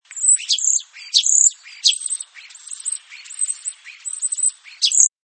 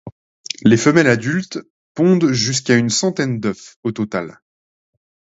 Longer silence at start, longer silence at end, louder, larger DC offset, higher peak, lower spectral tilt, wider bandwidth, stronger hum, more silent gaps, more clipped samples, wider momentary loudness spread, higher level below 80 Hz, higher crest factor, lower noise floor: about the same, 0.1 s vs 0.05 s; second, 0.2 s vs 1.05 s; about the same, -17 LUFS vs -17 LUFS; neither; about the same, 0 dBFS vs 0 dBFS; second, 10.5 dB/octave vs -5 dB/octave; first, 10 kHz vs 8 kHz; neither; second, none vs 0.12-0.44 s, 1.70-1.95 s, 3.76-3.83 s; neither; about the same, 17 LU vs 16 LU; second, under -90 dBFS vs -56 dBFS; about the same, 20 dB vs 18 dB; second, -41 dBFS vs under -90 dBFS